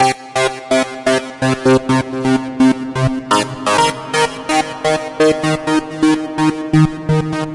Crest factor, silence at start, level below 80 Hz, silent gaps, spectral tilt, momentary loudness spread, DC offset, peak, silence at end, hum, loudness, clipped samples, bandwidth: 14 dB; 0 s; -42 dBFS; none; -5 dB/octave; 4 LU; under 0.1%; -2 dBFS; 0 s; none; -16 LUFS; under 0.1%; 11.5 kHz